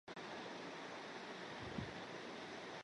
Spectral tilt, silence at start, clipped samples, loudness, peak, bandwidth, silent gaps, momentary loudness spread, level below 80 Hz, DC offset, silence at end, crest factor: -4.5 dB/octave; 0.05 s; under 0.1%; -49 LUFS; -30 dBFS; 11 kHz; none; 2 LU; -72 dBFS; under 0.1%; 0 s; 20 dB